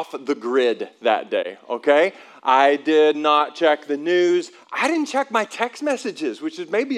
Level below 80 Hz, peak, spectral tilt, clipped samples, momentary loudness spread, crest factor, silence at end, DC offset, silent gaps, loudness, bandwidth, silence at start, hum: under -90 dBFS; -2 dBFS; -3.5 dB/octave; under 0.1%; 10 LU; 18 dB; 0 s; under 0.1%; none; -20 LUFS; 12 kHz; 0 s; none